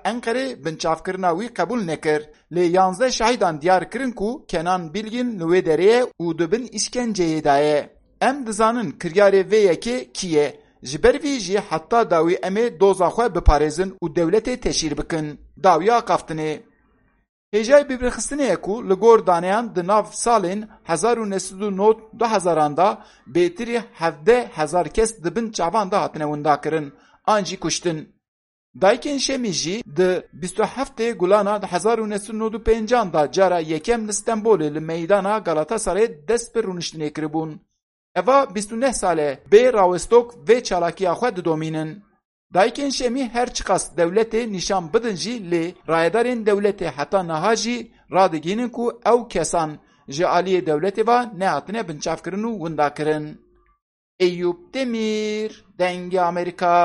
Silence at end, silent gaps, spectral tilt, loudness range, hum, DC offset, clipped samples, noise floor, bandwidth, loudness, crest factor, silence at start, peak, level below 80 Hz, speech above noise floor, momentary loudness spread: 0 s; 17.29-17.52 s, 28.28-28.74 s, 37.83-38.15 s, 42.25-42.50 s, 53.82-54.19 s; -4.5 dB/octave; 4 LU; none; under 0.1%; under 0.1%; -61 dBFS; 11.5 kHz; -20 LUFS; 20 dB; 0.05 s; 0 dBFS; -40 dBFS; 41 dB; 9 LU